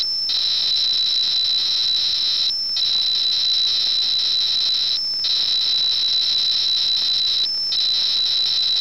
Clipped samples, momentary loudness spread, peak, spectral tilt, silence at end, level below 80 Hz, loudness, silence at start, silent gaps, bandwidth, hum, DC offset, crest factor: under 0.1%; 2 LU; -12 dBFS; 1 dB/octave; 0 s; -60 dBFS; -16 LUFS; 0 s; none; 18 kHz; none; 0.7%; 8 dB